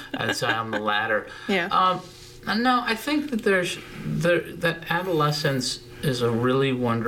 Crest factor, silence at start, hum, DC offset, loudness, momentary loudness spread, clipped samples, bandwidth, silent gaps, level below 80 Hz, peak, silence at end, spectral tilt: 18 dB; 0 s; none; under 0.1%; -24 LUFS; 7 LU; under 0.1%; 18 kHz; none; -52 dBFS; -6 dBFS; 0 s; -5 dB/octave